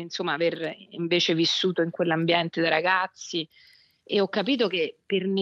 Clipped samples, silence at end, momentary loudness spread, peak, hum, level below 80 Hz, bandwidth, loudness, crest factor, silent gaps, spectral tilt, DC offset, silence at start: under 0.1%; 0 s; 10 LU; -6 dBFS; none; -78 dBFS; 7.8 kHz; -25 LUFS; 20 dB; none; -4.5 dB/octave; under 0.1%; 0 s